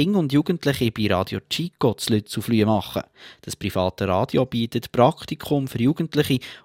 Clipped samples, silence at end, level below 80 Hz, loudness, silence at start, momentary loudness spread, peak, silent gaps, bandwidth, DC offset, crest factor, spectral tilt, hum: under 0.1%; 0.05 s; -54 dBFS; -23 LUFS; 0 s; 10 LU; -2 dBFS; none; 16.5 kHz; under 0.1%; 20 dB; -6 dB/octave; none